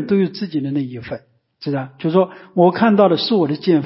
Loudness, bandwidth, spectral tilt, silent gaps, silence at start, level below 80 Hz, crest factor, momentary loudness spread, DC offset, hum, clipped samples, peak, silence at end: -17 LUFS; 5.8 kHz; -11.5 dB/octave; none; 0 s; -58 dBFS; 16 dB; 16 LU; under 0.1%; none; under 0.1%; -2 dBFS; 0 s